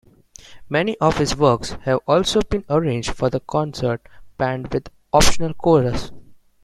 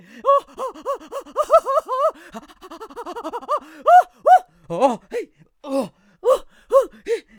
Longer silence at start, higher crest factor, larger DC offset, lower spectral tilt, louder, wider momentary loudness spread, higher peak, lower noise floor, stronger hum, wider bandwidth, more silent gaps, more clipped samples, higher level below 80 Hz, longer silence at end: first, 0.5 s vs 0.15 s; about the same, 20 dB vs 18 dB; neither; about the same, -5 dB/octave vs -4.5 dB/octave; about the same, -20 LUFS vs -19 LUFS; second, 9 LU vs 21 LU; about the same, 0 dBFS vs -2 dBFS; first, -45 dBFS vs -40 dBFS; neither; second, 16 kHz vs over 20 kHz; neither; neither; first, -34 dBFS vs -58 dBFS; about the same, 0.3 s vs 0.2 s